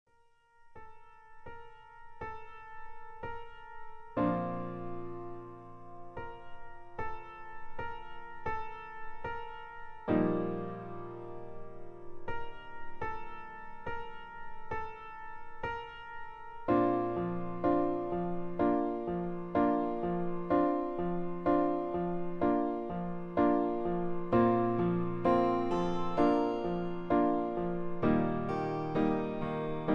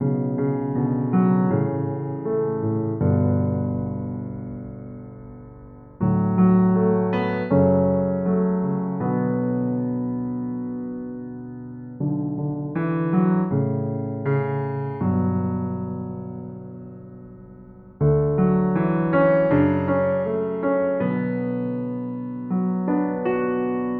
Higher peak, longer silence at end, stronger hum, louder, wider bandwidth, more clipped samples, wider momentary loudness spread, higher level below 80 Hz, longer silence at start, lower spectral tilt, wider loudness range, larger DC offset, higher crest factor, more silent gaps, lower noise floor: second, -14 dBFS vs -6 dBFS; about the same, 0 s vs 0 s; neither; second, -33 LUFS vs -23 LUFS; first, 6.6 kHz vs 4.3 kHz; neither; first, 19 LU vs 16 LU; about the same, -52 dBFS vs -50 dBFS; first, 0.6 s vs 0 s; second, -9 dB/octave vs -12.5 dB/octave; first, 14 LU vs 7 LU; neither; about the same, 18 dB vs 16 dB; neither; first, -66 dBFS vs -44 dBFS